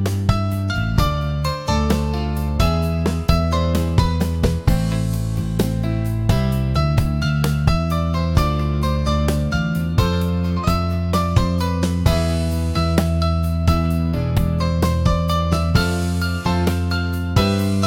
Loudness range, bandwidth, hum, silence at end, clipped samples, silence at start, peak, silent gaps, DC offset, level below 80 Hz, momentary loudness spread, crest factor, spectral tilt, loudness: 1 LU; 17 kHz; none; 0 s; under 0.1%; 0 s; -2 dBFS; none; 0.1%; -26 dBFS; 3 LU; 16 dB; -6.5 dB/octave; -20 LUFS